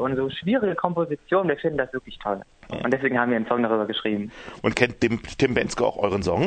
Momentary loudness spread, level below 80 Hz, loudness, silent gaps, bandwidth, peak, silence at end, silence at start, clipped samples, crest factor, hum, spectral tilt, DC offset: 8 LU; -50 dBFS; -24 LUFS; none; 9.2 kHz; -2 dBFS; 0 s; 0 s; under 0.1%; 22 dB; none; -6 dB/octave; under 0.1%